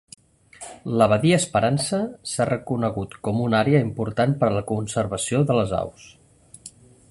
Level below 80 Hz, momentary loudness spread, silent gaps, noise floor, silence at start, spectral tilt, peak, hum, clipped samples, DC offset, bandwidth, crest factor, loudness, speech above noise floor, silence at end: -50 dBFS; 17 LU; none; -47 dBFS; 0.6 s; -5.5 dB/octave; -4 dBFS; none; under 0.1%; under 0.1%; 11.5 kHz; 20 dB; -22 LUFS; 25 dB; 0.4 s